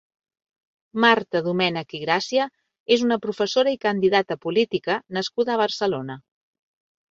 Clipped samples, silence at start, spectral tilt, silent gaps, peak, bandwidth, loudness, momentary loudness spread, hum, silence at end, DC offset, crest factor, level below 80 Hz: under 0.1%; 0.95 s; -4.5 dB/octave; 2.80-2.86 s; -2 dBFS; 7.8 kHz; -22 LUFS; 10 LU; none; 0.9 s; under 0.1%; 22 dB; -66 dBFS